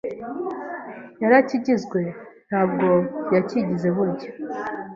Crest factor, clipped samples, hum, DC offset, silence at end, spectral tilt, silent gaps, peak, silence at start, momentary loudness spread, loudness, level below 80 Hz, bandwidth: 20 dB; under 0.1%; none; under 0.1%; 0 s; -8 dB/octave; none; -2 dBFS; 0.05 s; 15 LU; -23 LUFS; -64 dBFS; 7.4 kHz